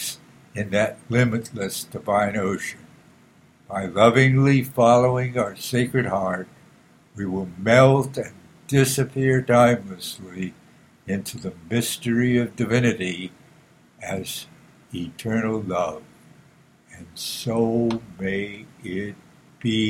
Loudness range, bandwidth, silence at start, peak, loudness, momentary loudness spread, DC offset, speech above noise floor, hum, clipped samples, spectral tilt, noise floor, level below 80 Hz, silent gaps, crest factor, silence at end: 9 LU; 16 kHz; 0 s; 0 dBFS; -22 LUFS; 17 LU; under 0.1%; 33 dB; none; under 0.1%; -5.5 dB/octave; -54 dBFS; -56 dBFS; none; 22 dB; 0 s